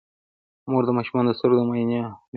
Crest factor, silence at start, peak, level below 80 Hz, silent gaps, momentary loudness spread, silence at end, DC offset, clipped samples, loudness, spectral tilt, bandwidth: 16 dB; 0.65 s; -6 dBFS; -64 dBFS; 2.28-2.33 s; 7 LU; 0 s; under 0.1%; under 0.1%; -22 LUFS; -11 dB/octave; 4.9 kHz